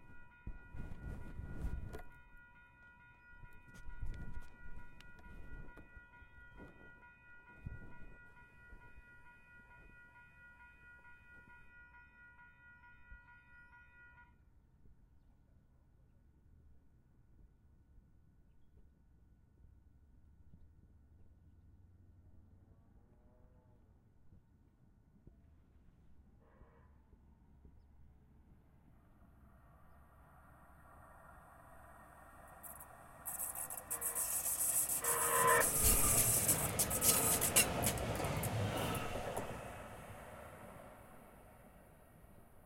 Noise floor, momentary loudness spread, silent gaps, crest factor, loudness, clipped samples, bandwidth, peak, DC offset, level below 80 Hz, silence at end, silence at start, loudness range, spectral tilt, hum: -68 dBFS; 30 LU; none; 28 dB; -34 LUFS; under 0.1%; 16.5 kHz; -16 dBFS; under 0.1%; -56 dBFS; 0.1 s; 0 s; 29 LU; -2.5 dB/octave; none